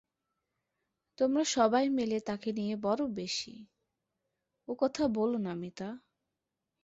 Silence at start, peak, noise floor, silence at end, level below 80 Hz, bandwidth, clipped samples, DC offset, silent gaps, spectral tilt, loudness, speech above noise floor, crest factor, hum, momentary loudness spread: 1.2 s; -14 dBFS; -87 dBFS; 0.85 s; -70 dBFS; 8.2 kHz; under 0.1%; under 0.1%; none; -4.5 dB/octave; -32 LUFS; 56 dB; 20 dB; none; 15 LU